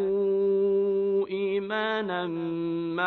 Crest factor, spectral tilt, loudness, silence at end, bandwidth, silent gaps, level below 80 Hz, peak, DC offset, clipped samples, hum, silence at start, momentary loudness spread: 14 dB; -8.5 dB/octave; -27 LUFS; 0 s; 4.4 kHz; none; -68 dBFS; -12 dBFS; under 0.1%; under 0.1%; none; 0 s; 6 LU